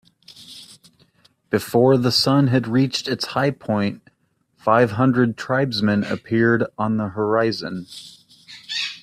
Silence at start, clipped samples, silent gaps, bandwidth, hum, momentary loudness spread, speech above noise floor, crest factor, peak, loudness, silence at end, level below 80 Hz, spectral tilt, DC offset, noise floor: 0.4 s; under 0.1%; none; 14.5 kHz; none; 20 LU; 47 dB; 18 dB; -2 dBFS; -20 LUFS; 0.05 s; -60 dBFS; -6 dB/octave; under 0.1%; -66 dBFS